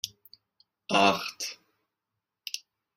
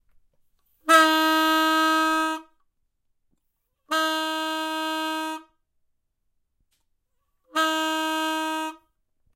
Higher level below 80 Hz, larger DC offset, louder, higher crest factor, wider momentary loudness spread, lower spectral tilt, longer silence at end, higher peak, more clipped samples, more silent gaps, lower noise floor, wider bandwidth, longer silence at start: about the same, -70 dBFS vs -70 dBFS; neither; second, -28 LUFS vs -22 LUFS; about the same, 26 dB vs 22 dB; first, 22 LU vs 13 LU; first, -3 dB/octave vs 0.5 dB/octave; second, 0.4 s vs 0.6 s; second, -8 dBFS vs -4 dBFS; neither; neither; first, -86 dBFS vs -75 dBFS; about the same, 16 kHz vs 16.5 kHz; second, 0.05 s vs 0.85 s